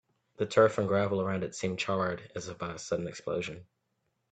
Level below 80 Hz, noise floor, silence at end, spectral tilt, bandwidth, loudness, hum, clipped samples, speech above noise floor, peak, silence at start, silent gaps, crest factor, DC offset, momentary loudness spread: -66 dBFS; -79 dBFS; 0.7 s; -5.5 dB/octave; 9 kHz; -31 LUFS; none; under 0.1%; 48 dB; -10 dBFS; 0.4 s; none; 22 dB; under 0.1%; 14 LU